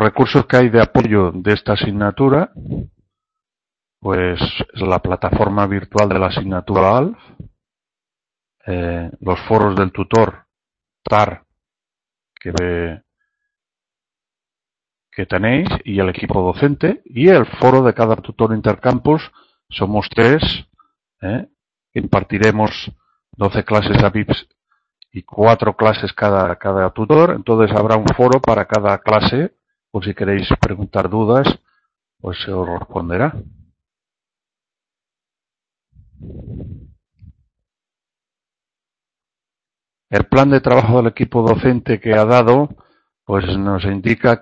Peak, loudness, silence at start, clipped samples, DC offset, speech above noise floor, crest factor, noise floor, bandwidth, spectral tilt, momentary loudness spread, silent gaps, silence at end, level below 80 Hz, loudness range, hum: 0 dBFS; -15 LUFS; 0 s; under 0.1%; under 0.1%; 75 dB; 16 dB; -90 dBFS; 8 kHz; -7.5 dB/octave; 15 LU; none; 0.05 s; -38 dBFS; 9 LU; none